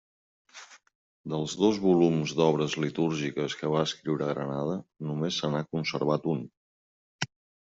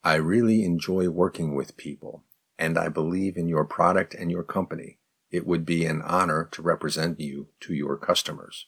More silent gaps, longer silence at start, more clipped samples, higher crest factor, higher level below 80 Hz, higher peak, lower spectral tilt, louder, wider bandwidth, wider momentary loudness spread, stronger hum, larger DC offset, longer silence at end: first, 0.95-1.24 s, 6.57-7.19 s vs none; first, 0.55 s vs 0.05 s; neither; about the same, 20 dB vs 20 dB; second, -68 dBFS vs -58 dBFS; second, -10 dBFS vs -6 dBFS; about the same, -6 dB/octave vs -5.5 dB/octave; second, -29 LUFS vs -26 LUFS; second, 8 kHz vs 18 kHz; about the same, 13 LU vs 12 LU; neither; neither; first, 0.45 s vs 0.05 s